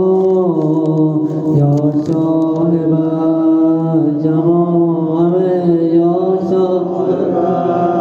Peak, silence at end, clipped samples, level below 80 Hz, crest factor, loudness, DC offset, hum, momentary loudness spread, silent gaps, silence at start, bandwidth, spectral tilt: -2 dBFS; 0 s; under 0.1%; -60 dBFS; 10 dB; -13 LUFS; under 0.1%; none; 3 LU; none; 0 s; 6.6 kHz; -11 dB/octave